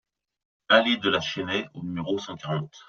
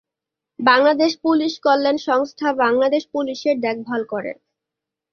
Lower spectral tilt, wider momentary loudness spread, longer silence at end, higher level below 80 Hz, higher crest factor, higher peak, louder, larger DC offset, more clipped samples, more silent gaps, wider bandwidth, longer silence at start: second, -2.5 dB/octave vs -4 dB/octave; about the same, 11 LU vs 11 LU; second, 0.05 s vs 0.8 s; about the same, -66 dBFS vs -66 dBFS; first, 24 dB vs 18 dB; about the same, -4 dBFS vs -2 dBFS; second, -25 LUFS vs -19 LUFS; neither; neither; neither; about the same, 7.2 kHz vs 6.8 kHz; about the same, 0.7 s vs 0.6 s